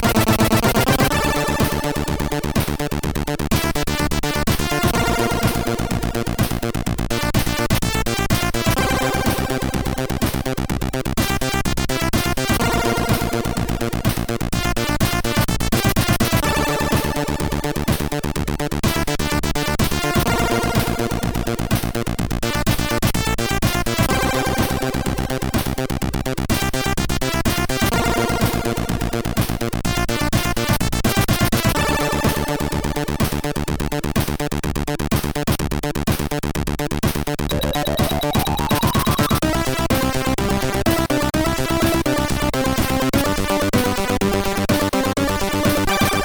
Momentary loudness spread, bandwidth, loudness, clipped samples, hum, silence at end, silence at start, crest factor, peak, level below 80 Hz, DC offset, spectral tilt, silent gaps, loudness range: 5 LU; over 20 kHz; -20 LUFS; under 0.1%; none; 0 s; 0 s; 16 dB; -2 dBFS; -28 dBFS; under 0.1%; -4.5 dB/octave; none; 2 LU